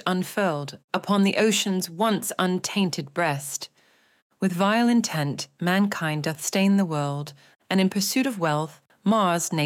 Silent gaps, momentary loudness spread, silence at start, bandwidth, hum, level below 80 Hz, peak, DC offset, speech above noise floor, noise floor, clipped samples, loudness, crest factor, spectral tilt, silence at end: 0.84-0.88 s, 4.22-4.30 s; 9 LU; 0.05 s; 17 kHz; none; -76 dBFS; -8 dBFS; under 0.1%; 38 dB; -62 dBFS; under 0.1%; -24 LUFS; 16 dB; -4.5 dB/octave; 0 s